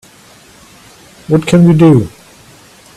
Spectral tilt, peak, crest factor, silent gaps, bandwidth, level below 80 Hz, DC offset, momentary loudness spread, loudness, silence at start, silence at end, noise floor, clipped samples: -8 dB/octave; 0 dBFS; 12 dB; none; 13 kHz; -44 dBFS; under 0.1%; 9 LU; -9 LUFS; 1.3 s; 0.9 s; -41 dBFS; 0.2%